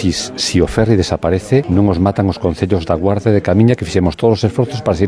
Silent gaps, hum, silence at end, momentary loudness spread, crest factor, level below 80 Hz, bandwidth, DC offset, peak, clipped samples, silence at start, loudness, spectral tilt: none; none; 0 s; 5 LU; 14 dB; -32 dBFS; 11 kHz; under 0.1%; 0 dBFS; under 0.1%; 0 s; -14 LUFS; -6.5 dB/octave